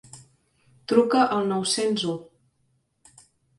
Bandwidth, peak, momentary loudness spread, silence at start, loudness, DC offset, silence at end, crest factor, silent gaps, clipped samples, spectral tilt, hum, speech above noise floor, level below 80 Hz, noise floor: 11.5 kHz; -6 dBFS; 12 LU; 0.15 s; -23 LUFS; under 0.1%; 1.35 s; 20 dB; none; under 0.1%; -4 dB/octave; none; 47 dB; -68 dBFS; -70 dBFS